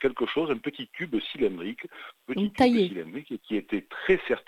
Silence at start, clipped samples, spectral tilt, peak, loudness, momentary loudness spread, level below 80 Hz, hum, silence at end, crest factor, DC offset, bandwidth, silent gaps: 0 s; under 0.1%; -6.5 dB/octave; -8 dBFS; -28 LUFS; 15 LU; -58 dBFS; none; 0.05 s; 20 dB; under 0.1%; 14 kHz; none